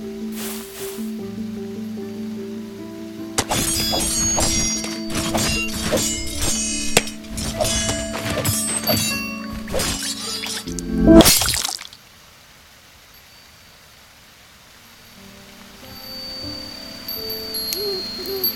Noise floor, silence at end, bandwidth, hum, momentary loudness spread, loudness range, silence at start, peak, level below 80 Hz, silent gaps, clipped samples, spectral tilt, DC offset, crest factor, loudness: -47 dBFS; 0 s; 17 kHz; none; 15 LU; 15 LU; 0 s; 0 dBFS; -36 dBFS; none; under 0.1%; -3 dB/octave; under 0.1%; 22 dB; -20 LUFS